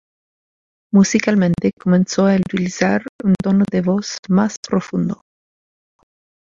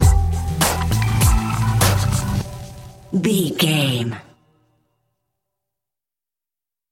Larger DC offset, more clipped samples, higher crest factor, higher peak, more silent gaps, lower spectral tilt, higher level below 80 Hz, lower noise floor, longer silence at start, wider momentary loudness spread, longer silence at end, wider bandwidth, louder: neither; neither; about the same, 16 dB vs 18 dB; about the same, -2 dBFS vs -2 dBFS; first, 1.73-1.77 s, 3.09-3.19 s, 4.19-4.23 s, 4.57-4.63 s vs none; first, -6 dB/octave vs -4.5 dB/octave; second, -52 dBFS vs -26 dBFS; about the same, under -90 dBFS vs -90 dBFS; first, 0.95 s vs 0 s; second, 7 LU vs 15 LU; second, 1.35 s vs 2.7 s; second, 7.6 kHz vs 17 kHz; about the same, -17 LUFS vs -19 LUFS